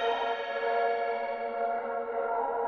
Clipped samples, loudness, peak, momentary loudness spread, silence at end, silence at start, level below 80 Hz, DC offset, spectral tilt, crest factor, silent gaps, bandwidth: under 0.1%; -31 LUFS; -18 dBFS; 4 LU; 0 s; 0 s; -72 dBFS; under 0.1%; -3.5 dB/octave; 14 dB; none; 6.6 kHz